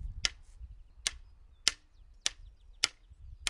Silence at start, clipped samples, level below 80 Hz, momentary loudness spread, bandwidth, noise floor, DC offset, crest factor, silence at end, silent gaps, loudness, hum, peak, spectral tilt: 0 s; under 0.1%; -50 dBFS; 22 LU; 11.5 kHz; -58 dBFS; under 0.1%; 36 dB; 0 s; none; -34 LUFS; none; -2 dBFS; 0.5 dB/octave